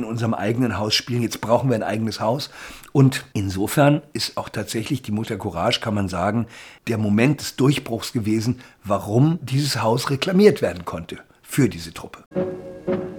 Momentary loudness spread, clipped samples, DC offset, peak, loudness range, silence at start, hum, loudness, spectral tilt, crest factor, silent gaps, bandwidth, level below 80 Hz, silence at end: 13 LU; under 0.1%; under 0.1%; -2 dBFS; 2 LU; 0 s; none; -22 LUFS; -5.5 dB/octave; 20 dB; 12.26-12.31 s; 19.5 kHz; -56 dBFS; 0 s